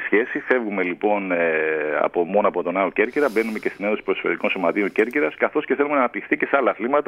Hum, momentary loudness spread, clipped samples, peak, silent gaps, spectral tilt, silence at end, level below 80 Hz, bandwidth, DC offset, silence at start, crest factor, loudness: none; 3 LU; under 0.1%; -2 dBFS; none; -6.5 dB/octave; 0.05 s; -64 dBFS; 15 kHz; under 0.1%; 0 s; 18 dB; -21 LUFS